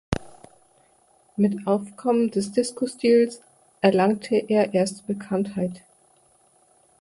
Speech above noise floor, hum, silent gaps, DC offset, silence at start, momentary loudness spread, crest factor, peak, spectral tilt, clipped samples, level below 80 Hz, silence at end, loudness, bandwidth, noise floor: 38 dB; none; none; under 0.1%; 0.1 s; 12 LU; 20 dB; -4 dBFS; -6 dB/octave; under 0.1%; -52 dBFS; 1.25 s; -23 LUFS; 11.5 kHz; -60 dBFS